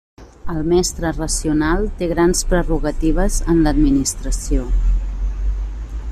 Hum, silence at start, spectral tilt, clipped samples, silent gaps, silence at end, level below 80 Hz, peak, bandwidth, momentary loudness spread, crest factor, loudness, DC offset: none; 0.2 s; -5 dB/octave; under 0.1%; none; 0 s; -20 dBFS; -4 dBFS; 13.5 kHz; 10 LU; 14 dB; -19 LUFS; under 0.1%